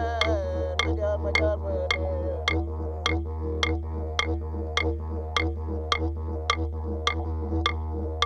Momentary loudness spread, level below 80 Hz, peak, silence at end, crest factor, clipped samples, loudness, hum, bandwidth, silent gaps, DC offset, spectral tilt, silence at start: 6 LU; -32 dBFS; -6 dBFS; 0 s; 22 dB; under 0.1%; -28 LUFS; none; 9 kHz; none; under 0.1%; -5 dB/octave; 0 s